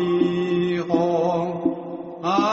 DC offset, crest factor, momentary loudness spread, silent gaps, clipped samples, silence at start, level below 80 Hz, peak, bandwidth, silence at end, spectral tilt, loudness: under 0.1%; 16 dB; 8 LU; none; under 0.1%; 0 s; -60 dBFS; -6 dBFS; 7.6 kHz; 0 s; -6 dB/octave; -22 LUFS